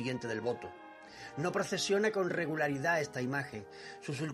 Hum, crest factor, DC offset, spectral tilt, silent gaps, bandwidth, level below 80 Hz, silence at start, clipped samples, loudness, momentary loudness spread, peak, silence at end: none; 18 dB; under 0.1%; -4.5 dB/octave; none; 14.5 kHz; -72 dBFS; 0 s; under 0.1%; -34 LUFS; 18 LU; -18 dBFS; 0 s